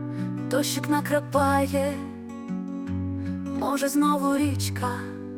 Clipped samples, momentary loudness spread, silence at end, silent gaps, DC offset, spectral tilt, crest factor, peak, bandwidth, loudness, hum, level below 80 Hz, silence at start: under 0.1%; 11 LU; 0 s; none; under 0.1%; -5.5 dB/octave; 16 dB; -10 dBFS; 18 kHz; -26 LUFS; none; -62 dBFS; 0 s